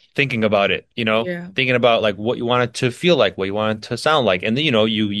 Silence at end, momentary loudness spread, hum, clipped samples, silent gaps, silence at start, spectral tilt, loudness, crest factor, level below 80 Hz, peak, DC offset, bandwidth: 0 s; 6 LU; none; under 0.1%; none; 0.15 s; -5.5 dB/octave; -18 LUFS; 18 dB; -58 dBFS; 0 dBFS; under 0.1%; 12.5 kHz